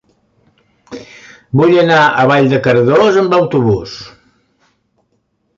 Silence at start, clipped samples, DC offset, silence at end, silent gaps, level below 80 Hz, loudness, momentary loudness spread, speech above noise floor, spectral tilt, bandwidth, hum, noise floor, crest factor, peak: 0.9 s; under 0.1%; under 0.1%; 1.5 s; none; -48 dBFS; -10 LUFS; 22 LU; 52 dB; -7 dB/octave; 7.6 kHz; none; -63 dBFS; 12 dB; 0 dBFS